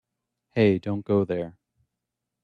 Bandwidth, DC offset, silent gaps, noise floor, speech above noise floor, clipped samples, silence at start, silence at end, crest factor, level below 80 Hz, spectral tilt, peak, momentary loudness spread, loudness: 6 kHz; under 0.1%; none; -84 dBFS; 61 dB; under 0.1%; 0.55 s; 0.95 s; 20 dB; -62 dBFS; -9 dB/octave; -8 dBFS; 10 LU; -25 LUFS